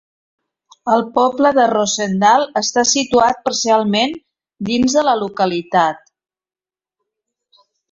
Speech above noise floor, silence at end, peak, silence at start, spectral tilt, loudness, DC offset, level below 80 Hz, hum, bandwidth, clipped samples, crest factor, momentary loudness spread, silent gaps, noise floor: 65 dB; 1.95 s; -2 dBFS; 0.85 s; -3 dB/octave; -15 LUFS; under 0.1%; -54 dBFS; none; 8 kHz; under 0.1%; 16 dB; 8 LU; none; -80 dBFS